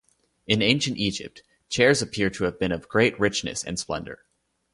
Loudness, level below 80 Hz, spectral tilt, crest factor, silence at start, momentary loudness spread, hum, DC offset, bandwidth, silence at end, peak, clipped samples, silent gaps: -24 LUFS; -52 dBFS; -4 dB/octave; 24 dB; 0.5 s; 12 LU; none; under 0.1%; 11.5 kHz; 0.6 s; -2 dBFS; under 0.1%; none